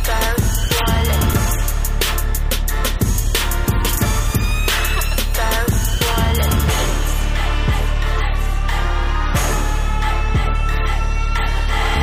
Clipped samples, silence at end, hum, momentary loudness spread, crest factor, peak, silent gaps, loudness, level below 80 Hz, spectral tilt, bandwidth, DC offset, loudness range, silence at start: under 0.1%; 0 s; none; 4 LU; 10 dB; -6 dBFS; none; -19 LUFS; -18 dBFS; -4 dB/octave; 16 kHz; under 0.1%; 2 LU; 0 s